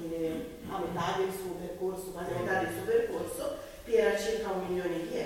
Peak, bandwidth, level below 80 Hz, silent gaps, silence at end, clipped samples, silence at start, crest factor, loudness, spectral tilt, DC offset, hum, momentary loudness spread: -14 dBFS; 17 kHz; -56 dBFS; none; 0 s; under 0.1%; 0 s; 18 dB; -33 LUFS; -5 dB/octave; under 0.1%; none; 10 LU